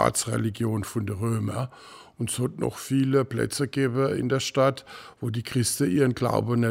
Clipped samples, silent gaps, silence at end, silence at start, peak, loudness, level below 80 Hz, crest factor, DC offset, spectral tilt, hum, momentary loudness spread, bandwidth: under 0.1%; none; 0 s; 0 s; -6 dBFS; -26 LUFS; -56 dBFS; 20 dB; under 0.1%; -5.5 dB/octave; none; 10 LU; 16 kHz